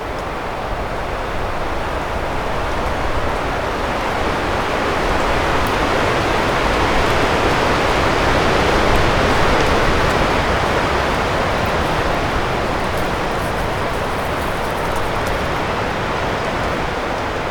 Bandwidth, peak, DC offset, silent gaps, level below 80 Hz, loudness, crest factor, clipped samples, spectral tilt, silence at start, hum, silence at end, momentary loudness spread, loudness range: 19.5 kHz; 0 dBFS; under 0.1%; none; -26 dBFS; -18 LUFS; 16 dB; under 0.1%; -5 dB/octave; 0 s; none; 0 s; 7 LU; 5 LU